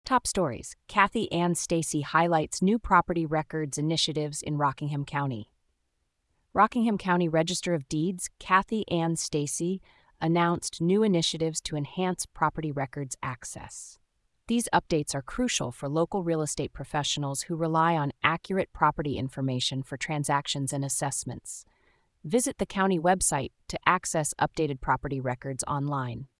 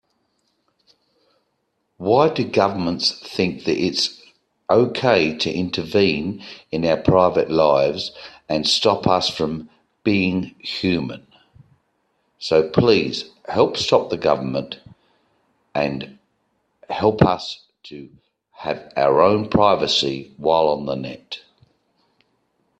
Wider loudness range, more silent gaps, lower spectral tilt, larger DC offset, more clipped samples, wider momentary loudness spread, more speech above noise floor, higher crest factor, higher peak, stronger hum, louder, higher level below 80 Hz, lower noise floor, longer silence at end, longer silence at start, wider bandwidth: about the same, 4 LU vs 5 LU; neither; about the same, -4.5 dB/octave vs -5.5 dB/octave; neither; neither; second, 9 LU vs 16 LU; second, 48 dB vs 52 dB; about the same, 22 dB vs 20 dB; second, -6 dBFS vs 0 dBFS; neither; second, -28 LUFS vs -19 LUFS; about the same, -52 dBFS vs -52 dBFS; first, -76 dBFS vs -71 dBFS; second, 0.15 s vs 1.4 s; second, 0.05 s vs 2 s; about the same, 12 kHz vs 12 kHz